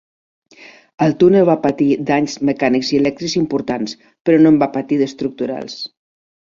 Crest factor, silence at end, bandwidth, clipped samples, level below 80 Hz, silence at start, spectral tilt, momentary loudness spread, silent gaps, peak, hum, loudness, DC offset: 14 dB; 0.6 s; 7.4 kHz; under 0.1%; -54 dBFS; 1 s; -6 dB/octave; 12 LU; 4.21-4.25 s; -2 dBFS; none; -16 LUFS; under 0.1%